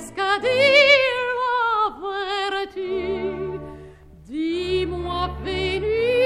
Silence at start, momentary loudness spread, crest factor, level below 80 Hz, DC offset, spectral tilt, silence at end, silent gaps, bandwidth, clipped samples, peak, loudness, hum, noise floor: 0 s; 14 LU; 18 dB; -42 dBFS; under 0.1%; -4.5 dB/octave; 0 s; none; 13.5 kHz; under 0.1%; -4 dBFS; -21 LUFS; none; -44 dBFS